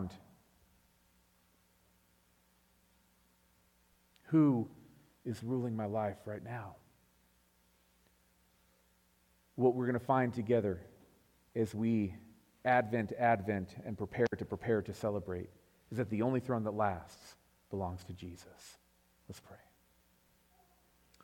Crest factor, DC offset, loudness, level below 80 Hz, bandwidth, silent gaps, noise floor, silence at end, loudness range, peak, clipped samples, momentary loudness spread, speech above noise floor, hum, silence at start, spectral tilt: 22 dB; under 0.1%; -35 LUFS; -72 dBFS; 18 kHz; none; -71 dBFS; 1.7 s; 14 LU; -16 dBFS; under 0.1%; 21 LU; 37 dB; none; 0 s; -8 dB/octave